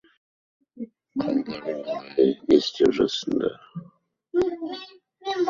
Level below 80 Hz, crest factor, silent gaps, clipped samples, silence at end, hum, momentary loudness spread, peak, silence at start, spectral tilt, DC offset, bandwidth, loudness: -58 dBFS; 20 dB; none; under 0.1%; 0 s; none; 19 LU; -6 dBFS; 0.75 s; -5.5 dB/octave; under 0.1%; 7.4 kHz; -24 LUFS